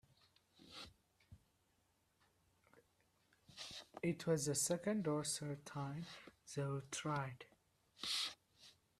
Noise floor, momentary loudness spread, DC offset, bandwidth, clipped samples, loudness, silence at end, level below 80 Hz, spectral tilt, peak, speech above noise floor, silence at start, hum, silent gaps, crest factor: -80 dBFS; 20 LU; under 0.1%; 14.5 kHz; under 0.1%; -43 LUFS; 0.3 s; -78 dBFS; -4 dB/octave; -26 dBFS; 38 dB; 0.6 s; none; none; 20 dB